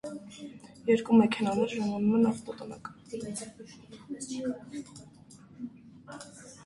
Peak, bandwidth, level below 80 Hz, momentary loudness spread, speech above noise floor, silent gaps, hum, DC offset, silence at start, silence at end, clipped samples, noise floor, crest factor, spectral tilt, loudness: -10 dBFS; 11.5 kHz; -68 dBFS; 23 LU; 23 dB; none; none; under 0.1%; 0.05 s; 0 s; under 0.1%; -54 dBFS; 20 dB; -6 dB/octave; -29 LUFS